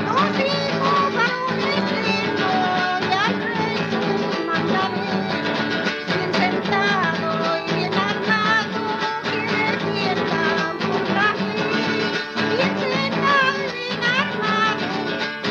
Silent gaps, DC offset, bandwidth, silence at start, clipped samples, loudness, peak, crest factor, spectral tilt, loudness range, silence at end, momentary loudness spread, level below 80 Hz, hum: none; under 0.1%; 8.6 kHz; 0 s; under 0.1%; -20 LUFS; -6 dBFS; 16 dB; -5 dB/octave; 1 LU; 0 s; 4 LU; -62 dBFS; none